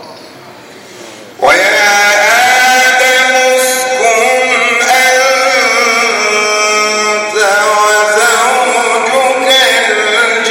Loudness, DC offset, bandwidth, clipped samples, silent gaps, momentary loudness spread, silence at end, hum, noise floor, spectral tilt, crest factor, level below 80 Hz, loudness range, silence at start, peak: -8 LUFS; under 0.1%; 17 kHz; under 0.1%; none; 4 LU; 0 s; none; -32 dBFS; 0.5 dB/octave; 10 dB; -58 dBFS; 2 LU; 0 s; 0 dBFS